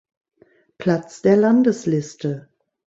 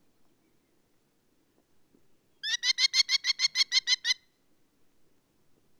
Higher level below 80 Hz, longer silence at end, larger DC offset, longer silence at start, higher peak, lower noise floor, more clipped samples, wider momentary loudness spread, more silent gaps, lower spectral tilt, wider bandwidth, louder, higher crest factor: first, -62 dBFS vs -82 dBFS; second, 0.5 s vs 1.65 s; neither; second, 0.8 s vs 2.45 s; first, -4 dBFS vs -12 dBFS; second, -49 dBFS vs -70 dBFS; neither; first, 13 LU vs 9 LU; neither; first, -7.5 dB/octave vs 5 dB/octave; second, 8 kHz vs 19.5 kHz; first, -19 LUFS vs -25 LUFS; second, 16 dB vs 22 dB